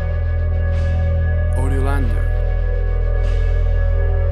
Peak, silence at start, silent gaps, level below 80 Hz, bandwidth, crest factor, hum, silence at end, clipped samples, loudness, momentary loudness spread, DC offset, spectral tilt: -6 dBFS; 0 s; none; -18 dBFS; 9.4 kHz; 10 dB; none; 0 s; under 0.1%; -20 LUFS; 2 LU; under 0.1%; -8 dB/octave